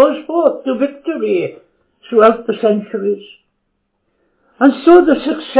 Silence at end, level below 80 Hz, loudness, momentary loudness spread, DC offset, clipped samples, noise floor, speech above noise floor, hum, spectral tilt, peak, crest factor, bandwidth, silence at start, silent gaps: 0 s; -56 dBFS; -14 LUFS; 11 LU; under 0.1%; 0.3%; -68 dBFS; 55 dB; none; -10 dB/octave; 0 dBFS; 14 dB; 4 kHz; 0 s; none